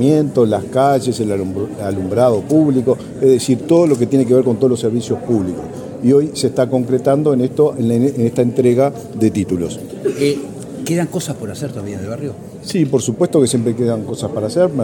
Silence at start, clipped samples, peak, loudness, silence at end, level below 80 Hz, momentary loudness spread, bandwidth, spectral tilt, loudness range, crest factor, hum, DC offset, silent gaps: 0 s; under 0.1%; 0 dBFS; -16 LUFS; 0 s; -52 dBFS; 11 LU; 17 kHz; -6.5 dB/octave; 6 LU; 14 dB; none; under 0.1%; none